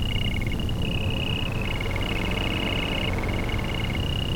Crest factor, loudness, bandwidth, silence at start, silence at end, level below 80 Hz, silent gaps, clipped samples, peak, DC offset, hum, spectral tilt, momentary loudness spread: 14 dB; -27 LUFS; 19 kHz; 0 s; 0 s; -30 dBFS; none; under 0.1%; -12 dBFS; under 0.1%; none; -5.5 dB/octave; 2 LU